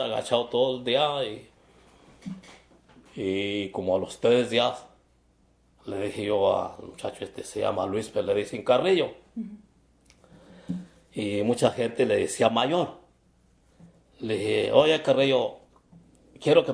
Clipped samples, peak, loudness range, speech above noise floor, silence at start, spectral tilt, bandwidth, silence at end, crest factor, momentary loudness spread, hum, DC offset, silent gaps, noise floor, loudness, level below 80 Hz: under 0.1%; -4 dBFS; 4 LU; 38 dB; 0 s; -5 dB/octave; 11 kHz; 0 s; 22 dB; 17 LU; none; under 0.1%; none; -63 dBFS; -26 LUFS; -64 dBFS